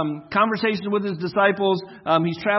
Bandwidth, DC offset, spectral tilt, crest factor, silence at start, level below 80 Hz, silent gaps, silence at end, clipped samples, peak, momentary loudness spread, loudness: 6 kHz; under 0.1%; -8 dB/octave; 18 dB; 0 s; -64 dBFS; none; 0 s; under 0.1%; -4 dBFS; 6 LU; -22 LUFS